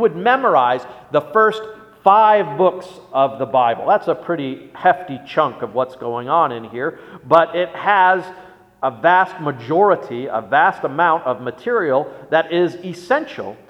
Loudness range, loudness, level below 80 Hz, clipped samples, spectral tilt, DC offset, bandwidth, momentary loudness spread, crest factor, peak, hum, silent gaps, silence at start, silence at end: 3 LU; -17 LUFS; -64 dBFS; under 0.1%; -6.5 dB/octave; under 0.1%; 11 kHz; 10 LU; 18 dB; 0 dBFS; none; none; 0 s; 0.15 s